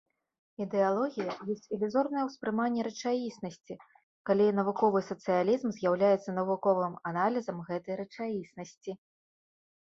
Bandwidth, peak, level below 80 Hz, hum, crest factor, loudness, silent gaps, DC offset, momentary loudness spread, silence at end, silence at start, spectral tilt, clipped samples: 7.6 kHz; -14 dBFS; -76 dBFS; none; 18 dB; -31 LUFS; 4.03-4.25 s; under 0.1%; 15 LU; 0.95 s; 0.6 s; -6.5 dB/octave; under 0.1%